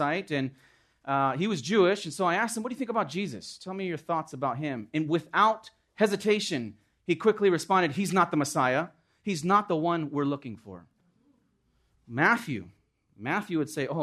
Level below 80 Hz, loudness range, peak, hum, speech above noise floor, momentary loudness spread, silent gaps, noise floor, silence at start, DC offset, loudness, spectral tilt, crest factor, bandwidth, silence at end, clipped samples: -72 dBFS; 5 LU; -10 dBFS; none; 43 dB; 14 LU; none; -71 dBFS; 0 s; under 0.1%; -28 LUFS; -5 dB/octave; 20 dB; 13.5 kHz; 0 s; under 0.1%